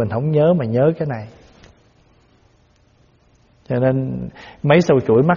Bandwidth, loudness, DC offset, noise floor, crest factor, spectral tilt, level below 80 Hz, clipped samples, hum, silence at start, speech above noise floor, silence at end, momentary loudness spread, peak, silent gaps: 7 kHz; -17 LUFS; under 0.1%; -55 dBFS; 18 dB; -7 dB/octave; -50 dBFS; under 0.1%; none; 0 s; 39 dB; 0 s; 16 LU; 0 dBFS; none